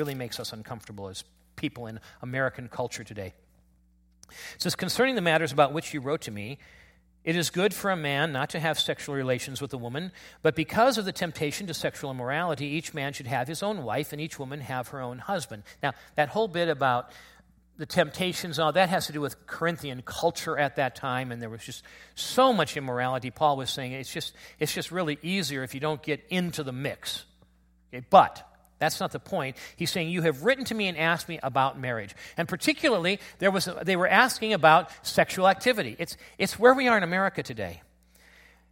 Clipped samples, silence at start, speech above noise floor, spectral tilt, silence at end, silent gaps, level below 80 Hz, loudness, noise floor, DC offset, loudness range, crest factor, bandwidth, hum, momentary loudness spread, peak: under 0.1%; 0 s; 35 dB; -4.5 dB/octave; 0.95 s; none; -62 dBFS; -27 LUFS; -63 dBFS; under 0.1%; 8 LU; 24 dB; 16.5 kHz; none; 15 LU; -4 dBFS